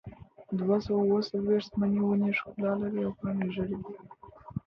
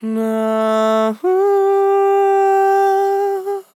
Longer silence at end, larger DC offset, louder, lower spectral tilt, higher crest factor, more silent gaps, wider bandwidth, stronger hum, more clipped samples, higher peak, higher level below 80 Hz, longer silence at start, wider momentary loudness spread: about the same, 0.1 s vs 0.15 s; neither; second, -30 LUFS vs -15 LUFS; first, -8.5 dB/octave vs -5.5 dB/octave; first, 16 dB vs 10 dB; neither; second, 6.2 kHz vs 14.5 kHz; neither; neither; second, -14 dBFS vs -6 dBFS; first, -58 dBFS vs under -90 dBFS; about the same, 0.05 s vs 0 s; first, 12 LU vs 5 LU